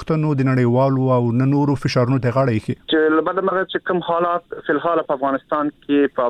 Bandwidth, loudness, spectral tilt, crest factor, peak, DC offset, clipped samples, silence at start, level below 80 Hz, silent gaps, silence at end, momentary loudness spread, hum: 9.2 kHz; -19 LUFS; -8 dB/octave; 12 dB; -6 dBFS; under 0.1%; under 0.1%; 0 s; -52 dBFS; none; 0 s; 5 LU; none